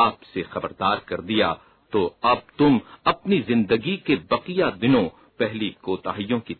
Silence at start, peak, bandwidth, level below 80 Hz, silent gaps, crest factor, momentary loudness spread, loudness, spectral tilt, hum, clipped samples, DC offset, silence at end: 0 s; -6 dBFS; 4.5 kHz; -56 dBFS; none; 16 dB; 9 LU; -23 LUFS; -9.5 dB/octave; none; under 0.1%; under 0.1%; 0.05 s